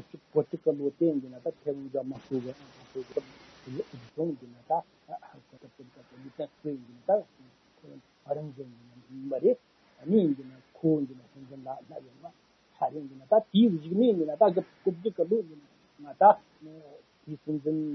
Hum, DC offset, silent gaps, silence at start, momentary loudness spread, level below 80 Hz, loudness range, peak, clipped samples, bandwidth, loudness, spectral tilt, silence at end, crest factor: none; under 0.1%; none; 0.15 s; 22 LU; -76 dBFS; 10 LU; -6 dBFS; under 0.1%; 6.2 kHz; -29 LUFS; -9 dB/octave; 0 s; 24 dB